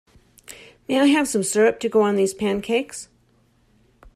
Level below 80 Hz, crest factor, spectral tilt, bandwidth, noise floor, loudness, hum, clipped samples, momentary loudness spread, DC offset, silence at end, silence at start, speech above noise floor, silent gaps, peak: -58 dBFS; 16 dB; -4 dB/octave; 14.5 kHz; -60 dBFS; -20 LUFS; none; under 0.1%; 23 LU; under 0.1%; 1.1 s; 0.5 s; 41 dB; none; -6 dBFS